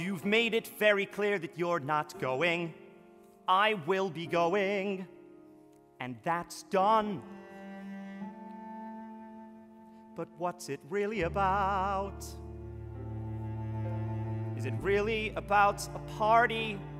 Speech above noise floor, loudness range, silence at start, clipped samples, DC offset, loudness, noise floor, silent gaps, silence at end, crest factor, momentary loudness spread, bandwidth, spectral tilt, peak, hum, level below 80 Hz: 27 dB; 8 LU; 0 s; under 0.1%; under 0.1%; -31 LUFS; -58 dBFS; none; 0 s; 22 dB; 18 LU; 16 kHz; -5.5 dB/octave; -10 dBFS; none; -54 dBFS